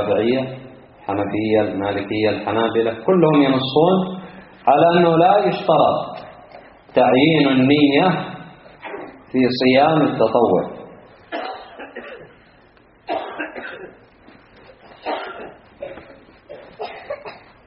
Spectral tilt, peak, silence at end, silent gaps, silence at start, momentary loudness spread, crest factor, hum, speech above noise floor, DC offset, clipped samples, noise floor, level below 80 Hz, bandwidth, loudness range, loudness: -4.5 dB/octave; -2 dBFS; 0.3 s; none; 0 s; 22 LU; 18 dB; none; 35 dB; under 0.1%; under 0.1%; -51 dBFS; -56 dBFS; 5.6 kHz; 17 LU; -17 LUFS